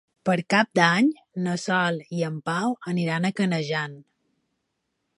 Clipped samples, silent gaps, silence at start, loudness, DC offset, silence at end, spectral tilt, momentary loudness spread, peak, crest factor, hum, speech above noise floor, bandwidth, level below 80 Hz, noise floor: under 0.1%; none; 0.25 s; -24 LUFS; under 0.1%; 1.15 s; -5.5 dB/octave; 9 LU; -2 dBFS; 22 dB; none; 54 dB; 11.5 kHz; -72 dBFS; -77 dBFS